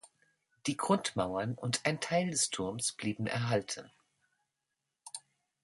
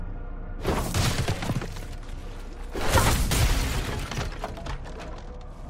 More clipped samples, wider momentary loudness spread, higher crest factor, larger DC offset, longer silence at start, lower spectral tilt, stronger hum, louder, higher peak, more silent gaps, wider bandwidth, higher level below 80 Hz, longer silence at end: neither; second, 12 LU vs 17 LU; about the same, 24 dB vs 20 dB; neither; about the same, 0.05 s vs 0 s; about the same, -4 dB/octave vs -4 dB/octave; neither; second, -33 LUFS vs -27 LUFS; second, -12 dBFS vs -8 dBFS; neither; second, 12 kHz vs 16 kHz; second, -68 dBFS vs -32 dBFS; first, 0.45 s vs 0 s